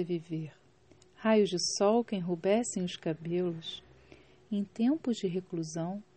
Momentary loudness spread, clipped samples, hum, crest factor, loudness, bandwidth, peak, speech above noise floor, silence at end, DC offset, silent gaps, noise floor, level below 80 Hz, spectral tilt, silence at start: 13 LU; under 0.1%; none; 18 dB; -32 LUFS; 8.4 kHz; -14 dBFS; 31 dB; 0.15 s; under 0.1%; none; -62 dBFS; -72 dBFS; -5 dB/octave; 0 s